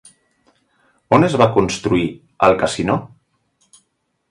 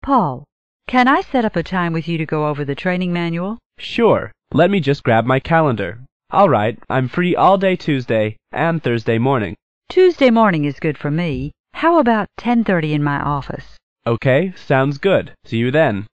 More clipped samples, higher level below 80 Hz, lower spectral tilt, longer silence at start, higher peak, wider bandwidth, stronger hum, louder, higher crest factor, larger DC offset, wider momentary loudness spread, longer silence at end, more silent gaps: neither; about the same, -46 dBFS vs -46 dBFS; second, -6 dB/octave vs -8 dB/octave; first, 1.1 s vs 0 s; about the same, 0 dBFS vs -2 dBFS; first, 11.5 kHz vs 8.6 kHz; neither; about the same, -17 LUFS vs -17 LUFS; about the same, 18 dB vs 14 dB; second, under 0.1% vs 0.9%; second, 7 LU vs 10 LU; first, 1.25 s vs 0.05 s; second, none vs 0.52-0.80 s, 3.66-3.70 s, 6.12-6.20 s, 9.62-9.81 s, 11.59-11.64 s, 13.83-13.96 s